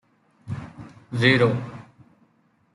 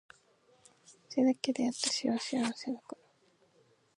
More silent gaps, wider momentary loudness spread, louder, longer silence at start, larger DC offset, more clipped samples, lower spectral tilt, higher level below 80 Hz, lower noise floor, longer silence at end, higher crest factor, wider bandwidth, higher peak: neither; first, 25 LU vs 13 LU; first, -21 LUFS vs -33 LUFS; second, 0.45 s vs 0.9 s; neither; neither; first, -6.5 dB/octave vs -3 dB/octave; first, -60 dBFS vs -82 dBFS; second, -64 dBFS vs -69 dBFS; about the same, 0.95 s vs 1.05 s; about the same, 22 dB vs 22 dB; about the same, 11.5 kHz vs 11.5 kHz; first, -4 dBFS vs -14 dBFS